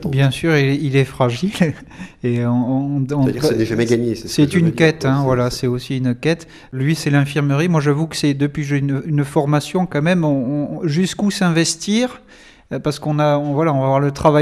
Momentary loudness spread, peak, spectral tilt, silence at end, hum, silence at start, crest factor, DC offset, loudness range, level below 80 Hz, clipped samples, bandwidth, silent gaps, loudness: 6 LU; 0 dBFS; -6 dB/octave; 0 s; none; 0 s; 16 dB; under 0.1%; 2 LU; -46 dBFS; under 0.1%; 14 kHz; none; -18 LUFS